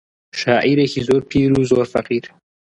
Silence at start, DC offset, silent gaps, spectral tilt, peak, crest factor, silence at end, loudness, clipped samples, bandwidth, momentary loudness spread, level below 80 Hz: 0.35 s; under 0.1%; none; -6.5 dB/octave; -2 dBFS; 16 dB; 0.4 s; -17 LUFS; under 0.1%; 11 kHz; 9 LU; -46 dBFS